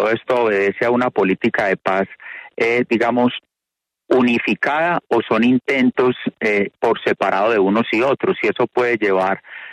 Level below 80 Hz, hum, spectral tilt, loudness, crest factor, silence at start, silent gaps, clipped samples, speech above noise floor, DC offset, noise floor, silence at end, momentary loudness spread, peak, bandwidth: -60 dBFS; none; -6.5 dB/octave; -17 LUFS; 14 dB; 0 s; none; under 0.1%; 66 dB; under 0.1%; -84 dBFS; 0 s; 5 LU; -2 dBFS; 9.6 kHz